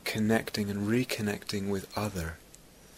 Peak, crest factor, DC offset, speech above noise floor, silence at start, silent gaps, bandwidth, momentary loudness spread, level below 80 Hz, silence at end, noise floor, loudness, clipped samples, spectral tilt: -12 dBFS; 20 dB; under 0.1%; 24 dB; 0.05 s; none; 16 kHz; 9 LU; -54 dBFS; 0 s; -54 dBFS; -31 LUFS; under 0.1%; -5 dB/octave